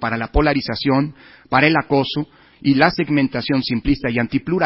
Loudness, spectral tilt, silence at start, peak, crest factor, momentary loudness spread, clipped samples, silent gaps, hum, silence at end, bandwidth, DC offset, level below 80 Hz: -18 LUFS; -9.5 dB/octave; 0 s; 0 dBFS; 18 dB; 8 LU; under 0.1%; none; none; 0 s; 5.8 kHz; under 0.1%; -34 dBFS